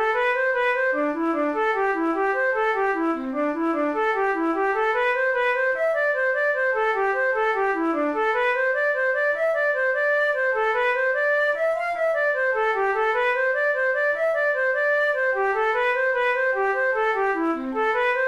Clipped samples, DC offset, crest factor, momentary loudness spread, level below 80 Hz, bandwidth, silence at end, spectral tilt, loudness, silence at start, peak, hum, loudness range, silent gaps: under 0.1%; 0.1%; 10 dB; 3 LU; -58 dBFS; 12 kHz; 0 s; -4 dB/octave; -22 LUFS; 0 s; -12 dBFS; none; 1 LU; none